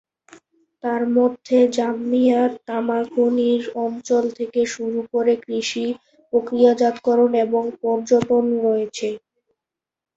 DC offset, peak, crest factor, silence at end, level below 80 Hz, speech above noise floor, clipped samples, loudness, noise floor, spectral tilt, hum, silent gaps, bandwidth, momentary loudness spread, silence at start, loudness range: under 0.1%; -4 dBFS; 16 dB; 1 s; -64 dBFS; 69 dB; under 0.1%; -20 LUFS; -88 dBFS; -5 dB/octave; none; none; 8 kHz; 9 LU; 0.85 s; 2 LU